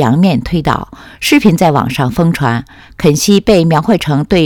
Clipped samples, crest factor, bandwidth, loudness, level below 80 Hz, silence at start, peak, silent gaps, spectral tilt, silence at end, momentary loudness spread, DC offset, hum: 0.5%; 10 dB; 18 kHz; -11 LUFS; -34 dBFS; 0 s; 0 dBFS; none; -5.5 dB/octave; 0 s; 8 LU; under 0.1%; none